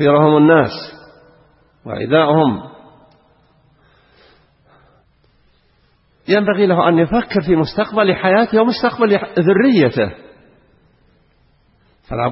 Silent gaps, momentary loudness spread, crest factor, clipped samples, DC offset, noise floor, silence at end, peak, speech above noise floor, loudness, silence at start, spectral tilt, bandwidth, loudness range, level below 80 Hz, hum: none; 14 LU; 16 dB; under 0.1%; under 0.1%; -57 dBFS; 0 s; 0 dBFS; 43 dB; -14 LUFS; 0 s; -11 dB/octave; 5.8 kHz; 6 LU; -48 dBFS; none